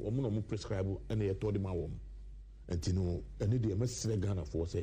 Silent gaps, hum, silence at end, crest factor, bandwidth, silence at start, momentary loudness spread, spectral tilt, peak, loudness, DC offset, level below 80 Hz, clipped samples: none; none; 0 s; 14 dB; 15 kHz; 0 s; 13 LU; -7 dB/octave; -22 dBFS; -36 LUFS; under 0.1%; -48 dBFS; under 0.1%